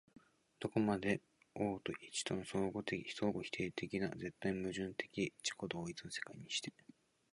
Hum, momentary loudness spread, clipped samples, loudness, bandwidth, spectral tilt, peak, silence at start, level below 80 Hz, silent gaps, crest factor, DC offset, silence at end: none; 7 LU; under 0.1%; -41 LUFS; 11.5 kHz; -4.5 dB/octave; -22 dBFS; 0.6 s; -70 dBFS; none; 20 dB; under 0.1%; 0.65 s